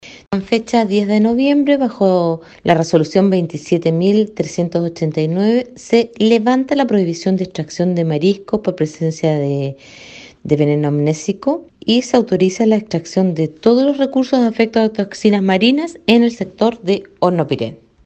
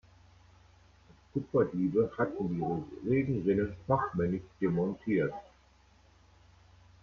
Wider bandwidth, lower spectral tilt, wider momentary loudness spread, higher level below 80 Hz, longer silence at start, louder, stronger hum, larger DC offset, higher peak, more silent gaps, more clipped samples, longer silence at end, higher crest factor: first, 8.6 kHz vs 6.8 kHz; second, -6.5 dB/octave vs -10 dB/octave; about the same, 7 LU vs 7 LU; first, -54 dBFS vs -60 dBFS; second, 0.05 s vs 1.35 s; first, -16 LUFS vs -32 LUFS; neither; neither; first, 0 dBFS vs -14 dBFS; neither; neither; second, 0.3 s vs 1.6 s; about the same, 16 dB vs 18 dB